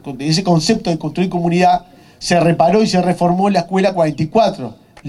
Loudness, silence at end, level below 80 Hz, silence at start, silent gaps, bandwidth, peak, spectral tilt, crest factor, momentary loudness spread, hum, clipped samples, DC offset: -15 LUFS; 0 s; -46 dBFS; 0.05 s; none; 12 kHz; 0 dBFS; -6 dB/octave; 14 dB; 7 LU; none; under 0.1%; under 0.1%